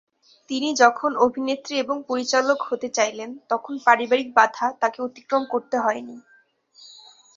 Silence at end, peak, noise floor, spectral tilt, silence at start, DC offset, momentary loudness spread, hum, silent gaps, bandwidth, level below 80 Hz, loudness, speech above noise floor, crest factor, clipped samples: 0.45 s; -2 dBFS; -59 dBFS; -2 dB/octave; 0.5 s; under 0.1%; 10 LU; none; none; 7.6 kHz; -72 dBFS; -22 LUFS; 37 dB; 22 dB; under 0.1%